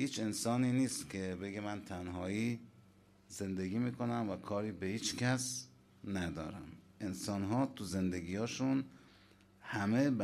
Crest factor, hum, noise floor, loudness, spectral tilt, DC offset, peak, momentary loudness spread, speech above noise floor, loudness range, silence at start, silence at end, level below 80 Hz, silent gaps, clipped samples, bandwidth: 16 dB; none; -65 dBFS; -38 LUFS; -5 dB/octave; under 0.1%; -22 dBFS; 12 LU; 28 dB; 2 LU; 0 s; 0 s; -68 dBFS; none; under 0.1%; 15 kHz